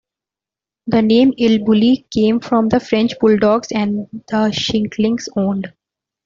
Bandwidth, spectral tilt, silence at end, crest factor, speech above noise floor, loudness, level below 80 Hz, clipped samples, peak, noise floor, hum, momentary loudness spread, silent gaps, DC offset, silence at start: 7.4 kHz; -6 dB/octave; 0.55 s; 14 dB; 74 dB; -16 LUFS; -50 dBFS; under 0.1%; -2 dBFS; -88 dBFS; none; 8 LU; none; under 0.1%; 0.85 s